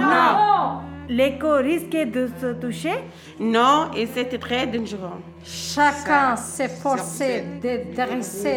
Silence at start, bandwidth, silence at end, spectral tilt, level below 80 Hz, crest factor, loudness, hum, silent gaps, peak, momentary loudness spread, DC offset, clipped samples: 0 s; 19 kHz; 0 s; -4 dB/octave; -56 dBFS; 18 dB; -22 LUFS; none; none; -4 dBFS; 13 LU; under 0.1%; under 0.1%